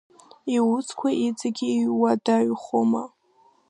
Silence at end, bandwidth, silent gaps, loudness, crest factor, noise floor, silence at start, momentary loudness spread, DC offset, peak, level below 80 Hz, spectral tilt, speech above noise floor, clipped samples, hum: 0.6 s; 10.5 kHz; none; -24 LUFS; 16 dB; -60 dBFS; 0.45 s; 6 LU; under 0.1%; -8 dBFS; -76 dBFS; -5.5 dB/octave; 38 dB; under 0.1%; none